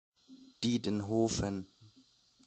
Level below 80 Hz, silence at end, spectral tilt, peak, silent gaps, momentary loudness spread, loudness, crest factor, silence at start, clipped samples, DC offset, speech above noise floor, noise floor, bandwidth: -58 dBFS; 0.6 s; -5 dB/octave; -18 dBFS; none; 10 LU; -34 LUFS; 18 dB; 0.3 s; under 0.1%; under 0.1%; 34 dB; -66 dBFS; 9 kHz